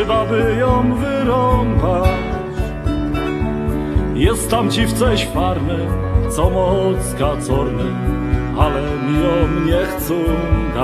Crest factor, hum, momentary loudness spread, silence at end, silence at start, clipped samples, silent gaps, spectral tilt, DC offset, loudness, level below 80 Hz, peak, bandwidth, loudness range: 16 dB; none; 5 LU; 0 s; 0 s; under 0.1%; none; -6.5 dB/octave; under 0.1%; -17 LUFS; -24 dBFS; 0 dBFS; 14 kHz; 1 LU